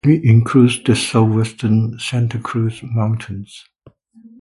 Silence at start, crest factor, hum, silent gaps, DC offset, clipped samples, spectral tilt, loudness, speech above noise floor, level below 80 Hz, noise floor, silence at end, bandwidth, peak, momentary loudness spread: 0.05 s; 16 dB; none; none; under 0.1%; under 0.1%; -6.5 dB/octave; -16 LUFS; 33 dB; -46 dBFS; -48 dBFS; 0.8 s; 11.5 kHz; 0 dBFS; 11 LU